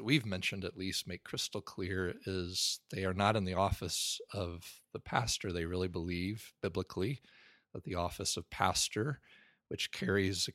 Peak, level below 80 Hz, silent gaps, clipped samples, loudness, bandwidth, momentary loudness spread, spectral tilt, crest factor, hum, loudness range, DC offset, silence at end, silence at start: -12 dBFS; -56 dBFS; none; under 0.1%; -36 LUFS; 16 kHz; 10 LU; -3.5 dB/octave; 24 dB; none; 3 LU; under 0.1%; 0.05 s; 0 s